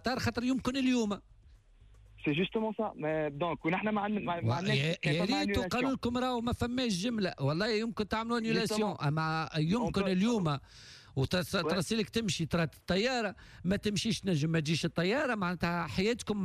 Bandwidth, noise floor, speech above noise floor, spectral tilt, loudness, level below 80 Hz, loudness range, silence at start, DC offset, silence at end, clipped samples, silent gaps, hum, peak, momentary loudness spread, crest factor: 14.5 kHz; -59 dBFS; 27 dB; -5.5 dB/octave; -32 LUFS; -54 dBFS; 2 LU; 0.05 s; under 0.1%; 0 s; under 0.1%; none; none; -18 dBFS; 4 LU; 14 dB